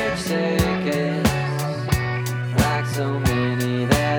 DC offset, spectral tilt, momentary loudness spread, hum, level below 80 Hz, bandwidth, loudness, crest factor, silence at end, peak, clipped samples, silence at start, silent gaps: under 0.1%; -5.5 dB/octave; 4 LU; none; -36 dBFS; 20 kHz; -22 LUFS; 18 dB; 0 s; -2 dBFS; under 0.1%; 0 s; none